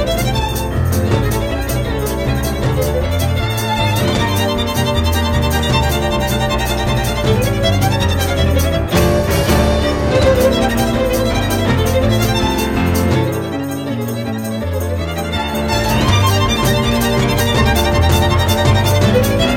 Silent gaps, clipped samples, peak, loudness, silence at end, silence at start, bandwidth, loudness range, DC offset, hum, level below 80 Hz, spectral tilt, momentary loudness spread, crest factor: none; under 0.1%; 0 dBFS; -15 LUFS; 0 s; 0 s; 17 kHz; 4 LU; under 0.1%; none; -24 dBFS; -5.5 dB/octave; 6 LU; 14 dB